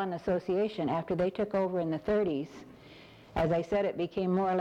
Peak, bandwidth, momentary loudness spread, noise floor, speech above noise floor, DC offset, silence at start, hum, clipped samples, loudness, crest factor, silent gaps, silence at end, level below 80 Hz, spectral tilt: -18 dBFS; 9.2 kHz; 8 LU; -53 dBFS; 23 dB; under 0.1%; 0 s; none; under 0.1%; -31 LUFS; 14 dB; none; 0 s; -54 dBFS; -8 dB/octave